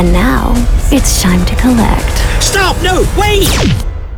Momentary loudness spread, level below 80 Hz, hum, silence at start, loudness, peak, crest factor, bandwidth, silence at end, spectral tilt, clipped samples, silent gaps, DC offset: 4 LU; -12 dBFS; none; 0 s; -11 LUFS; 0 dBFS; 10 dB; over 20 kHz; 0 s; -4.5 dB/octave; under 0.1%; none; under 0.1%